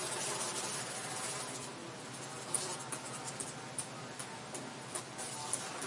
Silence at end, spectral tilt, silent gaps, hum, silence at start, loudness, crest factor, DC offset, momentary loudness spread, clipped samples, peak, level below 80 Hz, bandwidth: 0 s; -2 dB/octave; none; none; 0 s; -40 LUFS; 26 dB; under 0.1%; 8 LU; under 0.1%; -16 dBFS; -78 dBFS; 11.5 kHz